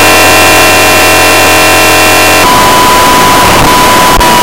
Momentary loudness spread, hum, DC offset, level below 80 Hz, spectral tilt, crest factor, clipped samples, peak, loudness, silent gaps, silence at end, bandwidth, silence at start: 2 LU; none; 10%; -22 dBFS; -2 dB/octave; 4 dB; 4%; 0 dBFS; -2 LUFS; none; 0 s; over 20 kHz; 0 s